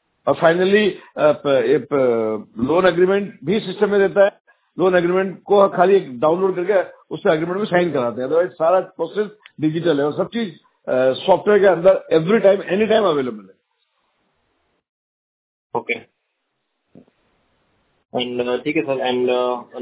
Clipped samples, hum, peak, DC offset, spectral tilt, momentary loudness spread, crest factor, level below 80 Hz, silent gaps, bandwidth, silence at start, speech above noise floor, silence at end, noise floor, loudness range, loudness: under 0.1%; none; 0 dBFS; under 0.1%; -10 dB/octave; 10 LU; 18 dB; -60 dBFS; 4.40-4.45 s, 14.89-15.70 s; 4 kHz; 0.25 s; 56 dB; 0 s; -73 dBFS; 16 LU; -18 LUFS